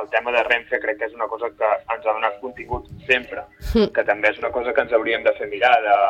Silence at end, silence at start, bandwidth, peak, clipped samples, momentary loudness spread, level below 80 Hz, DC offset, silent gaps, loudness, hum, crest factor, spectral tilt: 0 s; 0 s; 15.5 kHz; -4 dBFS; under 0.1%; 11 LU; -40 dBFS; under 0.1%; none; -21 LUFS; none; 16 dB; -5.5 dB/octave